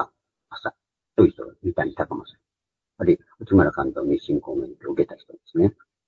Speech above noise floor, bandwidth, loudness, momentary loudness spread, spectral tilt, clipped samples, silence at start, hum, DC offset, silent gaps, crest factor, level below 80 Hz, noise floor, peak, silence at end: 65 dB; 4.4 kHz; -24 LUFS; 14 LU; -9.5 dB/octave; under 0.1%; 0 s; none; under 0.1%; none; 22 dB; -50 dBFS; -87 dBFS; -2 dBFS; 0.35 s